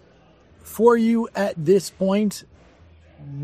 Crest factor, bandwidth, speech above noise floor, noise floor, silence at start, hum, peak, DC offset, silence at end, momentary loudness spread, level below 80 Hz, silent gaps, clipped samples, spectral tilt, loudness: 18 dB; 15 kHz; 34 dB; -53 dBFS; 0.65 s; none; -4 dBFS; under 0.1%; 0 s; 20 LU; -60 dBFS; none; under 0.1%; -6 dB/octave; -20 LUFS